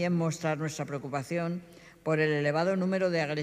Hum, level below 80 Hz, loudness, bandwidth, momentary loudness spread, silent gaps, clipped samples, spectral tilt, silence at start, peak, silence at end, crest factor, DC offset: none; -70 dBFS; -30 LUFS; 14 kHz; 9 LU; none; under 0.1%; -6 dB/octave; 0 s; -16 dBFS; 0 s; 14 dB; under 0.1%